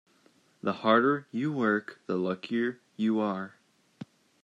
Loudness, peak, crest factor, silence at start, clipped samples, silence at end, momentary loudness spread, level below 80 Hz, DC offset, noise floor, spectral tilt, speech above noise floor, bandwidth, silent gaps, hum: -29 LUFS; -8 dBFS; 22 dB; 0.65 s; under 0.1%; 0.4 s; 22 LU; -82 dBFS; under 0.1%; -65 dBFS; -7.5 dB/octave; 36 dB; 7.6 kHz; none; none